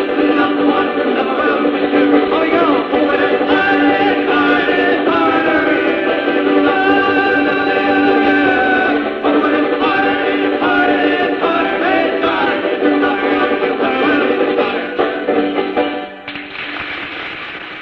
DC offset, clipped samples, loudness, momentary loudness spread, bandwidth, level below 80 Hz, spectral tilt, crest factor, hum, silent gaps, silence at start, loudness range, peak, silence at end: under 0.1%; under 0.1%; -14 LUFS; 6 LU; 5.8 kHz; -50 dBFS; -6.5 dB/octave; 14 dB; none; none; 0 s; 3 LU; 0 dBFS; 0 s